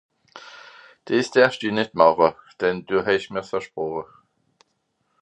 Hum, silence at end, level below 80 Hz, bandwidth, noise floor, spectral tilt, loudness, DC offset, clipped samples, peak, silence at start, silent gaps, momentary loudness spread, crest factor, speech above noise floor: none; 1.2 s; -62 dBFS; 10 kHz; -72 dBFS; -5 dB/octave; -22 LUFS; under 0.1%; under 0.1%; 0 dBFS; 0.35 s; none; 20 LU; 22 dB; 51 dB